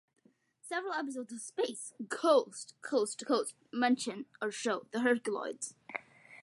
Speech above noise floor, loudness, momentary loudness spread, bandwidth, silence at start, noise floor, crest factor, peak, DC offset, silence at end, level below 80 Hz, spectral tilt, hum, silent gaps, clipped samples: 29 dB; -34 LUFS; 14 LU; 11.5 kHz; 0.65 s; -63 dBFS; 20 dB; -14 dBFS; under 0.1%; 0 s; under -90 dBFS; -3 dB/octave; none; none; under 0.1%